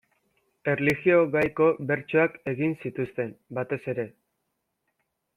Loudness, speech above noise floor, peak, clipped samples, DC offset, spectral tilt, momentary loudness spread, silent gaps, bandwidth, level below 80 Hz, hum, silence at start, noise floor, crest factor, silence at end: -26 LUFS; 54 dB; -8 dBFS; under 0.1%; under 0.1%; -8 dB/octave; 12 LU; none; 15.5 kHz; -64 dBFS; none; 0.65 s; -79 dBFS; 20 dB; 1.3 s